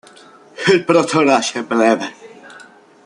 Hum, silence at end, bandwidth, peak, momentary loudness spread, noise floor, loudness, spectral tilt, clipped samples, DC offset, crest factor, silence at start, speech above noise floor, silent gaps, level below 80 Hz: none; 0.45 s; 11 kHz; 0 dBFS; 7 LU; -44 dBFS; -15 LUFS; -4.5 dB/octave; under 0.1%; under 0.1%; 16 dB; 0.6 s; 29 dB; none; -64 dBFS